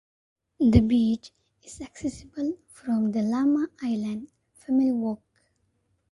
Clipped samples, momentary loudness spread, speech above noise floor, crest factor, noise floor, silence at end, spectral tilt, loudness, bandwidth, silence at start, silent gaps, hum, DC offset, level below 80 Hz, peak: under 0.1%; 18 LU; 47 dB; 22 dB; -71 dBFS; 0.95 s; -7.5 dB/octave; -26 LUFS; 11.5 kHz; 0.6 s; none; none; under 0.1%; -42 dBFS; -4 dBFS